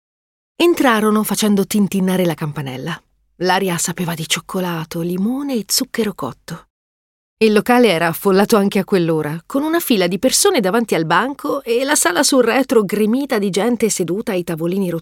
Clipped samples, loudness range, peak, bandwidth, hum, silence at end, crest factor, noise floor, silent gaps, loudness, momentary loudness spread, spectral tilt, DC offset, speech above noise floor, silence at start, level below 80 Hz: under 0.1%; 5 LU; -2 dBFS; 17 kHz; none; 0 s; 16 dB; under -90 dBFS; 6.70-7.37 s; -16 LUFS; 10 LU; -4 dB/octave; under 0.1%; over 74 dB; 0.6 s; -56 dBFS